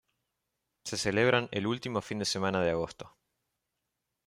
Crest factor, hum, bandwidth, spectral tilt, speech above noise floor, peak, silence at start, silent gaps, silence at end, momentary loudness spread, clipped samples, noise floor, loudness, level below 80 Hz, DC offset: 22 dB; none; 15 kHz; -4.5 dB/octave; 54 dB; -12 dBFS; 0.85 s; none; 1.2 s; 16 LU; under 0.1%; -85 dBFS; -30 LUFS; -64 dBFS; under 0.1%